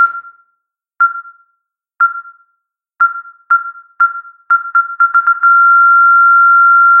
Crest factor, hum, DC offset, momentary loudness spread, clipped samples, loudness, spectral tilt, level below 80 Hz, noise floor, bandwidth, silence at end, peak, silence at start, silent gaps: 10 dB; none; under 0.1%; 20 LU; under 0.1%; -9 LUFS; -1.5 dB/octave; -76 dBFS; -69 dBFS; 2.2 kHz; 0 s; -2 dBFS; 0 s; none